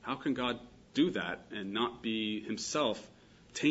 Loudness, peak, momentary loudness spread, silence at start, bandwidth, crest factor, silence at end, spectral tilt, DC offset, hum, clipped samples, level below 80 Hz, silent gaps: -35 LUFS; -16 dBFS; 9 LU; 0 s; 8 kHz; 20 dB; 0 s; -4 dB/octave; under 0.1%; none; under 0.1%; -66 dBFS; none